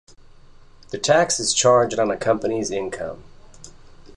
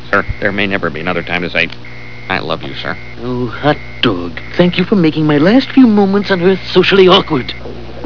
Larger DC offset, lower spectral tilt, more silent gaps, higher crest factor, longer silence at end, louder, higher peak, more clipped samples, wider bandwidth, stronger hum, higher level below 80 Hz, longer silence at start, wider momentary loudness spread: second, 0.1% vs 5%; second, -3 dB/octave vs -7 dB/octave; neither; about the same, 18 dB vs 14 dB; about the same, 0.05 s vs 0 s; second, -20 LUFS vs -12 LUFS; second, -4 dBFS vs 0 dBFS; second, under 0.1% vs 0.5%; first, 11.5 kHz vs 5.4 kHz; second, none vs 60 Hz at -35 dBFS; second, -52 dBFS vs -36 dBFS; first, 0.9 s vs 0 s; about the same, 16 LU vs 14 LU